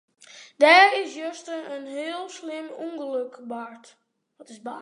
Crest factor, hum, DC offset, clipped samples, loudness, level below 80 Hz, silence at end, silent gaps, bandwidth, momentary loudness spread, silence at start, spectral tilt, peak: 22 dB; none; under 0.1%; under 0.1%; -21 LUFS; -88 dBFS; 0 s; none; 11 kHz; 21 LU; 0.35 s; -1.5 dB/octave; -2 dBFS